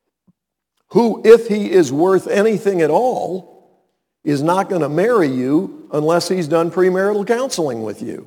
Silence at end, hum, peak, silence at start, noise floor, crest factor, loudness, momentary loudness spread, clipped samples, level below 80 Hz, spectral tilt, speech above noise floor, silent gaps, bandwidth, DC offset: 0.05 s; none; 0 dBFS; 0.9 s; -73 dBFS; 16 dB; -16 LUFS; 10 LU; under 0.1%; -64 dBFS; -6 dB/octave; 58 dB; none; 18 kHz; under 0.1%